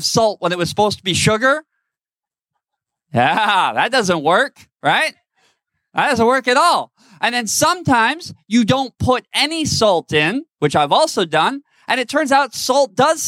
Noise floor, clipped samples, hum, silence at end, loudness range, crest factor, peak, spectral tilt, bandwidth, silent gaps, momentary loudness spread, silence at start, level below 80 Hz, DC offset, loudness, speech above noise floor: under -90 dBFS; under 0.1%; none; 0 s; 2 LU; 16 dB; -2 dBFS; -3.5 dB/octave; 16.5 kHz; none; 7 LU; 0 s; -56 dBFS; under 0.1%; -16 LUFS; over 74 dB